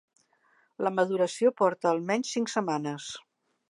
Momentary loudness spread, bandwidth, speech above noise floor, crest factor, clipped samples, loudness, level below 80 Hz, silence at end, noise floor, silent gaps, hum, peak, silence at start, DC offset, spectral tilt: 12 LU; 11.5 kHz; 40 dB; 18 dB; under 0.1%; -28 LUFS; -80 dBFS; 0.5 s; -67 dBFS; none; none; -12 dBFS; 0.8 s; under 0.1%; -4.5 dB/octave